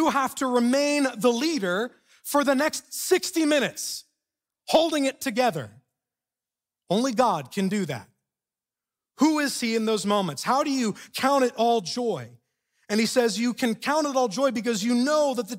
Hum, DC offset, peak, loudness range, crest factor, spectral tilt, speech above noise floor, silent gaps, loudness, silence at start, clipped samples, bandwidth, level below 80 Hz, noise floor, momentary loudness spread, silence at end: none; under 0.1%; -8 dBFS; 4 LU; 18 dB; -4 dB/octave; over 66 dB; none; -24 LUFS; 0 s; under 0.1%; 16 kHz; -70 dBFS; under -90 dBFS; 7 LU; 0 s